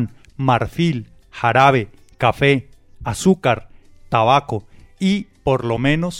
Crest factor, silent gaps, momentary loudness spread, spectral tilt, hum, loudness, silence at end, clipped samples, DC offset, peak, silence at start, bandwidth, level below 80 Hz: 18 dB; none; 13 LU; -6 dB/octave; none; -18 LUFS; 0 s; under 0.1%; under 0.1%; -2 dBFS; 0 s; 15.5 kHz; -42 dBFS